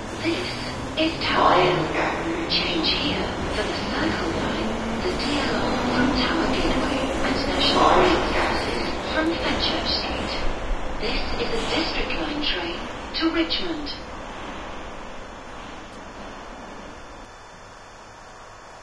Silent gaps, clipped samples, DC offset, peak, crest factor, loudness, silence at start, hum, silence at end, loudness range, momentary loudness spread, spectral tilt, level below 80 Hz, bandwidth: none; under 0.1%; under 0.1%; -6 dBFS; 20 dB; -23 LUFS; 0 s; none; 0 s; 16 LU; 19 LU; -4.5 dB/octave; -36 dBFS; 11 kHz